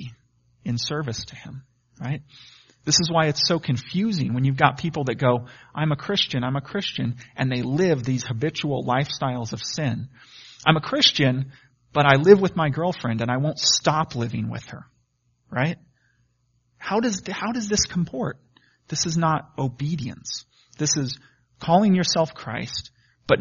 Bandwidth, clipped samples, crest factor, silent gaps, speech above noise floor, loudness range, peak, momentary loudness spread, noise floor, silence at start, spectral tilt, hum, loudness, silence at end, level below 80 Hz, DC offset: 7.2 kHz; under 0.1%; 24 dB; none; 45 dB; 7 LU; 0 dBFS; 15 LU; -68 dBFS; 0 s; -4 dB/octave; none; -23 LUFS; 0 s; -54 dBFS; under 0.1%